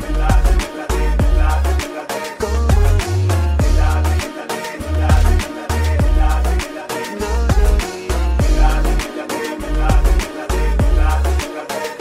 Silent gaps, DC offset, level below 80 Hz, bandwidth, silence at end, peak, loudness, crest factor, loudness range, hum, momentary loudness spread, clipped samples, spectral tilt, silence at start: none; under 0.1%; -16 dBFS; 15.5 kHz; 0 s; -2 dBFS; -18 LUFS; 14 dB; 2 LU; none; 8 LU; under 0.1%; -5.5 dB/octave; 0 s